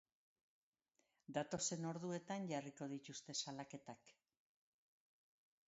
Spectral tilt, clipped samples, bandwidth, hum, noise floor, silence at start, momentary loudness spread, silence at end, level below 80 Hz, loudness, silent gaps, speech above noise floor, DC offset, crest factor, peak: -4.5 dB/octave; under 0.1%; 7.6 kHz; none; -85 dBFS; 1.3 s; 14 LU; 1.55 s; -86 dBFS; -47 LUFS; none; 38 dB; under 0.1%; 22 dB; -28 dBFS